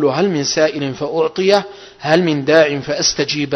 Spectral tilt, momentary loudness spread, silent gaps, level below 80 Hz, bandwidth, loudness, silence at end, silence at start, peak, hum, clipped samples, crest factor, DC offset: -4 dB/octave; 8 LU; none; -52 dBFS; 11 kHz; -15 LUFS; 0 s; 0 s; 0 dBFS; none; under 0.1%; 16 dB; under 0.1%